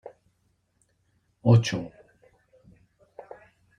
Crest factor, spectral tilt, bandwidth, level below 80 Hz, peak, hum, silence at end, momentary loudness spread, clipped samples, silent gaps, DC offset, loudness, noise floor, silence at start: 22 dB; -7 dB/octave; 9.4 kHz; -64 dBFS; -6 dBFS; none; 1.9 s; 26 LU; under 0.1%; none; under 0.1%; -23 LUFS; -71 dBFS; 0.05 s